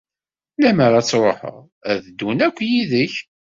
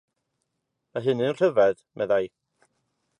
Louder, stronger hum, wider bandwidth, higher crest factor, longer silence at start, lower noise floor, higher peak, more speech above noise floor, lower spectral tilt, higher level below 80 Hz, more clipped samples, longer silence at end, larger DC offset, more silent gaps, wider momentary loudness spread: first, -18 LUFS vs -24 LUFS; neither; second, 7.6 kHz vs 10 kHz; about the same, 16 dB vs 18 dB; second, 0.6 s vs 0.95 s; first, under -90 dBFS vs -80 dBFS; first, -2 dBFS vs -8 dBFS; first, over 72 dB vs 56 dB; second, -5.5 dB/octave vs -7 dB/octave; first, -58 dBFS vs -70 dBFS; neither; second, 0.3 s vs 0.9 s; neither; first, 1.72-1.81 s vs none; about the same, 15 LU vs 13 LU